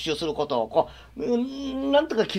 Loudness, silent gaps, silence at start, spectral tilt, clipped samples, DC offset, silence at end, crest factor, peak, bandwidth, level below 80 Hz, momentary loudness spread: -26 LUFS; none; 0 s; -5 dB/octave; under 0.1%; under 0.1%; 0 s; 18 dB; -8 dBFS; 14 kHz; -52 dBFS; 8 LU